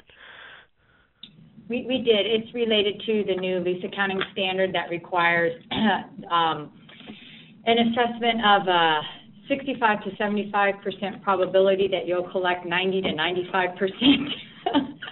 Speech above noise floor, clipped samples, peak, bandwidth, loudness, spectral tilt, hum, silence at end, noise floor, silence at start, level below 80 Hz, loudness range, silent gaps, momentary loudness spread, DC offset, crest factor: 39 dB; under 0.1%; -6 dBFS; 4.2 kHz; -23 LUFS; -2 dB/octave; none; 0 s; -62 dBFS; 0.2 s; -60 dBFS; 2 LU; none; 11 LU; under 0.1%; 18 dB